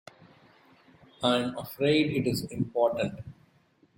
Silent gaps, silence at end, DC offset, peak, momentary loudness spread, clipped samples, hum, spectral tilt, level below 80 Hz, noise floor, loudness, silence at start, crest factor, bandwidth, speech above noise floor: none; 0.65 s; under 0.1%; -12 dBFS; 10 LU; under 0.1%; none; -5.5 dB/octave; -62 dBFS; -65 dBFS; -28 LUFS; 1.2 s; 18 dB; 16.5 kHz; 37 dB